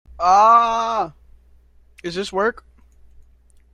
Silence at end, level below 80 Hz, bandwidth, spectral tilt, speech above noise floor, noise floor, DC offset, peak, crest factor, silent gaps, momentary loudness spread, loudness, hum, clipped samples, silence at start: 1.2 s; -48 dBFS; 10.5 kHz; -4 dB/octave; 35 dB; -52 dBFS; under 0.1%; -4 dBFS; 16 dB; none; 17 LU; -17 LUFS; none; under 0.1%; 0.2 s